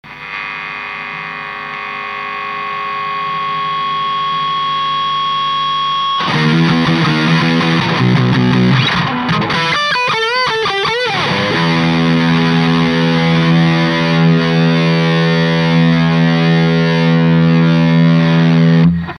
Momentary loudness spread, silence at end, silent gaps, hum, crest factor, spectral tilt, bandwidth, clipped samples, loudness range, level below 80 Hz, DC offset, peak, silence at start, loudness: 10 LU; 0 s; none; none; 12 dB; -6.5 dB/octave; 9.6 kHz; under 0.1%; 7 LU; -44 dBFS; under 0.1%; 0 dBFS; 0.05 s; -13 LUFS